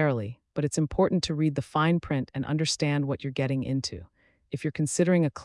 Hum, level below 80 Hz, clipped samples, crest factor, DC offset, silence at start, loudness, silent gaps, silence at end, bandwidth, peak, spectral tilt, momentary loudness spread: none; -54 dBFS; under 0.1%; 16 dB; under 0.1%; 0 s; -27 LUFS; none; 0 s; 12 kHz; -10 dBFS; -5.5 dB/octave; 9 LU